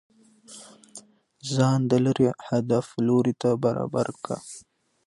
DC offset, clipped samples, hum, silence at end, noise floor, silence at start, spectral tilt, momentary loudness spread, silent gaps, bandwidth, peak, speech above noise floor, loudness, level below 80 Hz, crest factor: under 0.1%; under 0.1%; none; 0.45 s; -50 dBFS; 0.5 s; -7 dB/octave; 22 LU; none; 11.5 kHz; -8 dBFS; 26 dB; -24 LUFS; -62 dBFS; 18 dB